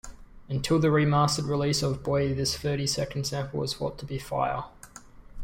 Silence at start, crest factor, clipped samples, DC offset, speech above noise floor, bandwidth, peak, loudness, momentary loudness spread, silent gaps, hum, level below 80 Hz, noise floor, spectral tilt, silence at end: 0.05 s; 16 dB; under 0.1%; under 0.1%; 22 dB; 16.5 kHz; -12 dBFS; -27 LUFS; 12 LU; none; none; -48 dBFS; -48 dBFS; -5 dB/octave; 0 s